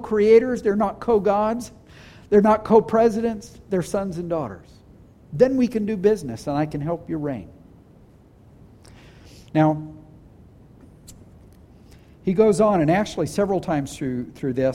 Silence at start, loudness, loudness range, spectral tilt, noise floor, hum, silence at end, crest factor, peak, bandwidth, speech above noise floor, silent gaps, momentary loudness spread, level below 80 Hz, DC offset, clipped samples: 0 s; -21 LUFS; 8 LU; -7 dB/octave; -50 dBFS; none; 0 s; 20 dB; -2 dBFS; 13.5 kHz; 30 dB; none; 14 LU; -50 dBFS; under 0.1%; under 0.1%